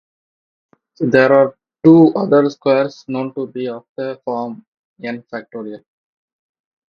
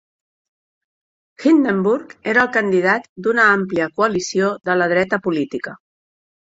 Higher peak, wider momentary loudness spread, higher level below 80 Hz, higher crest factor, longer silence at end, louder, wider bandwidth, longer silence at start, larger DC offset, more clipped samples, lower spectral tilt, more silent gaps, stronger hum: about the same, 0 dBFS vs -2 dBFS; first, 18 LU vs 8 LU; about the same, -60 dBFS vs -60 dBFS; about the same, 18 dB vs 18 dB; first, 1.15 s vs 0.8 s; about the same, -15 LUFS vs -17 LUFS; second, 6.6 kHz vs 8 kHz; second, 1 s vs 1.4 s; neither; neither; first, -8 dB/octave vs -5.5 dB/octave; first, 3.89-3.96 s, 4.68-4.72 s, 4.79-4.96 s vs 3.09-3.16 s; neither